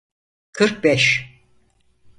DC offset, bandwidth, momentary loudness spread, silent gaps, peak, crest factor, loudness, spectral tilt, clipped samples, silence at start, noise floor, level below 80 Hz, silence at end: under 0.1%; 11.5 kHz; 9 LU; none; -2 dBFS; 20 dB; -17 LUFS; -4 dB/octave; under 0.1%; 0.55 s; -59 dBFS; -58 dBFS; 0.9 s